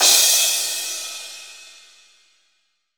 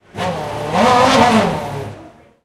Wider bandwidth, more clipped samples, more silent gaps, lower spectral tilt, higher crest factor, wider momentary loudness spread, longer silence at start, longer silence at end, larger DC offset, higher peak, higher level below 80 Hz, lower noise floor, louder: first, over 20 kHz vs 15.5 kHz; neither; neither; second, 4.5 dB/octave vs -4.5 dB/octave; first, 22 dB vs 16 dB; first, 24 LU vs 16 LU; second, 0 s vs 0.15 s; first, 1.35 s vs 0.35 s; first, 0.1% vs under 0.1%; about the same, 0 dBFS vs 0 dBFS; second, under -90 dBFS vs -42 dBFS; first, -68 dBFS vs -40 dBFS; about the same, -16 LUFS vs -14 LUFS